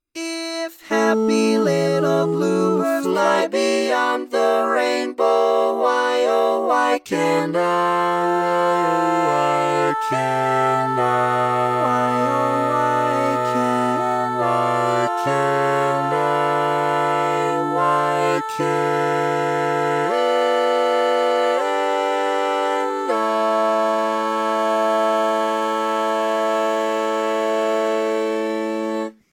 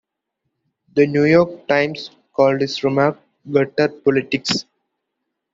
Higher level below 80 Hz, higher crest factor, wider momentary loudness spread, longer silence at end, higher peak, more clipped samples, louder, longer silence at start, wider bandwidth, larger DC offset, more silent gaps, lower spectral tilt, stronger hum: second, -76 dBFS vs -60 dBFS; about the same, 16 dB vs 18 dB; second, 3 LU vs 9 LU; second, 0.2 s vs 0.9 s; about the same, -4 dBFS vs -2 dBFS; neither; about the same, -19 LUFS vs -18 LUFS; second, 0.15 s vs 0.95 s; first, 18 kHz vs 7.8 kHz; neither; neither; about the same, -5 dB/octave vs -5.5 dB/octave; neither